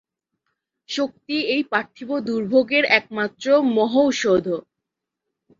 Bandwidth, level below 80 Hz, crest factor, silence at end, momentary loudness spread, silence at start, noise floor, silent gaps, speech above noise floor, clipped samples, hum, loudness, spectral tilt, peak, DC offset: 7.6 kHz; -64 dBFS; 20 dB; 1 s; 10 LU; 0.9 s; -83 dBFS; none; 63 dB; under 0.1%; none; -20 LUFS; -4 dB/octave; -2 dBFS; under 0.1%